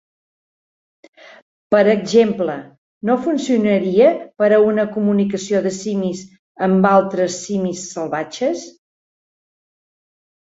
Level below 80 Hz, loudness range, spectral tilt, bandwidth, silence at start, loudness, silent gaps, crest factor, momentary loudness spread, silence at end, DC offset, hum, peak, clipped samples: -62 dBFS; 4 LU; -6 dB/octave; 8 kHz; 1.7 s; -17 LUFS; 2.78-3.01 s, 6.39-6.55 s; 18 dB; 10 LU; 1.75 s; under 0.1%; none; -2 dBFS; under 0.1%